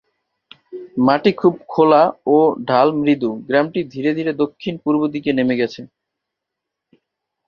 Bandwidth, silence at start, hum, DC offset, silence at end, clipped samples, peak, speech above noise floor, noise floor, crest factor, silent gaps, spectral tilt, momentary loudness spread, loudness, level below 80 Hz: 6.6 kHz; 0.7 s; none; under 0.1%; 1.6 s; under 0.1%; -2 dBFS; 65 dB; -81 dBFS; 18 dB; none; -8 dB/octave; 9 LU; -17 LUFS; -60 dBFS